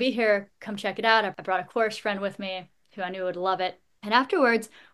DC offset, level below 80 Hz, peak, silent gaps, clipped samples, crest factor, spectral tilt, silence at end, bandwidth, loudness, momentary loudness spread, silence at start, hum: under 0.1%; -76 dBFS; -4 dBFS; none; under 0.1%; 22 dB; -4.5 dB/octave; 0.25 s; 12.5 kHz; -26 LUFS; 13 LU; 0 s; none